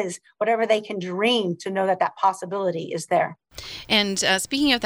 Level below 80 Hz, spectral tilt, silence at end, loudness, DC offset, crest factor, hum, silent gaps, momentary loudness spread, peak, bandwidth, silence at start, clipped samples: -56 dBFS; -3 dB/octave; 0 s; -23 LUFS; under 0.1%; 18 dB; none; none; 9 LU; -6 dBFS; over 20 kHz; 0 s; under 0.1%